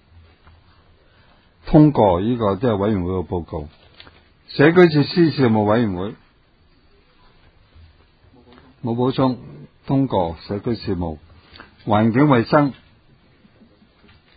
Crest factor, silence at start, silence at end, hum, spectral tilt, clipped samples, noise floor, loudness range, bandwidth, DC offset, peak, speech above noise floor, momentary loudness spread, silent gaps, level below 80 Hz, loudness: 20 dB; 1.65 s; 1.65 s; none; -10 dB/octave; under 0.1%; -55 dBFS; 9 LU; 5 kHz; under 0.1%; 0 dBFS; 38 dB; 17 LU; none; -42 dBFS; -18 LUFS